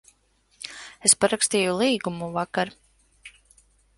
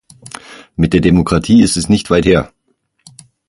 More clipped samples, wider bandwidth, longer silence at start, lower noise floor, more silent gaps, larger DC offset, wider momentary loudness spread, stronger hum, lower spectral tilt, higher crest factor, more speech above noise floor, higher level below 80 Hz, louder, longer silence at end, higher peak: neither; about the same, 12 kHz vs 11.5 kHz; about the same, 0.6 s vs 0.5 s; about the same, -65 dBFS vs -63 dBFS; neither; neither; about the same, 19 LU vs 21 LU; neither; second, -2.5 dB/octave vs -6 dB/octave; first, 24 dB vs 14 dB; second, 41 dB vs 52 dB; second, -62 dBFS vs -32 dBFS; second, -22 LUFS vs -12 LUFS; second, 0.7 s vs 1 s; about the same, -2 dBFS vs 0 dBFS